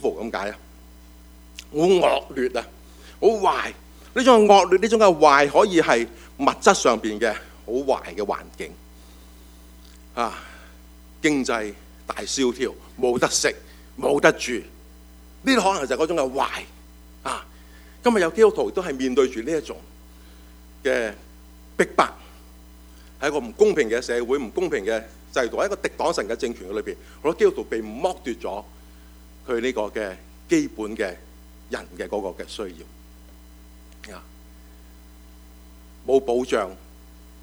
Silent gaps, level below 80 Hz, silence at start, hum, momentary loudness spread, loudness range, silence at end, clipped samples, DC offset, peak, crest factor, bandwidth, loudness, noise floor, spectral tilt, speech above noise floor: none; -48 dBFS; 0 s; none; 17 LU; 13 LU; 0.65 s; under 0.1%; under 0.1%; 0 dBFS; 24 dB; over 20 kHz; -22 LUFS; -46 dBFS; -3.5 dB/octave; 25 dB